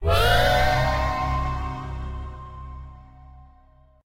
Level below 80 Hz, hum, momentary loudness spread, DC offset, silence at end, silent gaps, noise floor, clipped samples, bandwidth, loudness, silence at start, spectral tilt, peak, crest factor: -30 dBFS; none; 21 LU; under 0.1%; 0 s; none; -54 dBFS; under 0.1%; 16 kHz; -23 LUFS; 0 s; -5 dB/octave; -8 dBFS; 16 dB